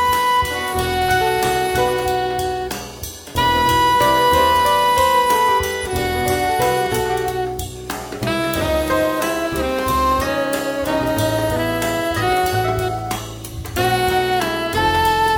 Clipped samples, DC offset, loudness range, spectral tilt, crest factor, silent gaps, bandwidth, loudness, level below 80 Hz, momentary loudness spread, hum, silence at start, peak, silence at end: under 0.1%; under 0.1%; 5 LU; -4 dB/octave; 14 dB; none; over 20 kHz; -18 LUFS; -36 dBFS; 10 LU; none; 0 s; -4 dBFS; 0 s